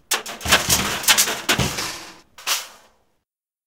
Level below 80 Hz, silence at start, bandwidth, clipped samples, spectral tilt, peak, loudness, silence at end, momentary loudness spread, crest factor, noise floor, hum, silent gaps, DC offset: -44 dBFS; 0.1 s; 18 kHz; under 0.1%; -1 dB/octave; 0 dBFS; -19 LUFS; 0.95 s; 14 LU; 22 dB; -77 dBFS; none; none; 0.1%